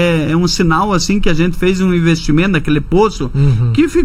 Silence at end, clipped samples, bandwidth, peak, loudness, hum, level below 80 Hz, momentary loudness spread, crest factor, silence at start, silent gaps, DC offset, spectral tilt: 0 s; under 0.1%; 14.5 kHz; 0 dBFS; -13 LUFS; none; -24 dBFS; 2 LU; 12 dB; 0 s; none; under 0.1%; -6 dB/octave